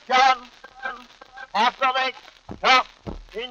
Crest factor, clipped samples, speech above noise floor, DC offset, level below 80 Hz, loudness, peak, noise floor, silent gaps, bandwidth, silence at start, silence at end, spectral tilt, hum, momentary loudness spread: 22 dB; under 0.1%; 23 dB; under 0.1%; -50 dBFS; -20 LUFS; 0 dBFS; -43 dBFS; none; 7.8 kHz; 0.1 s; 0 s; -2 dB/octave; none; 23 LU